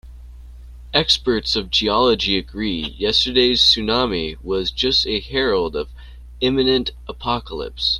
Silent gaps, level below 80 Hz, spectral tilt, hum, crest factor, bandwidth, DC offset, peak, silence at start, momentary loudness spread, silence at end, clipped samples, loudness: none; -36 dBFS; -4 dB/octave; none; 20 dB; 13 kHz; under 0.1%; 0 dBFS; 0.05 s; 11 LU; 0 s; under 0.1%; -18 LUFS